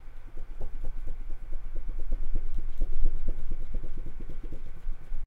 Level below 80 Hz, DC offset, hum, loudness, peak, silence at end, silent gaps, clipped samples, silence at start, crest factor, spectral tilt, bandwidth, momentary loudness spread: -28 dBFS; under 0.1%; none; -40 LUFS; -8 dBFS; 0 s; none; under 0.1%; 0 s; 14 dB; -8 dB/octave; 1.6 kHz; 9 LU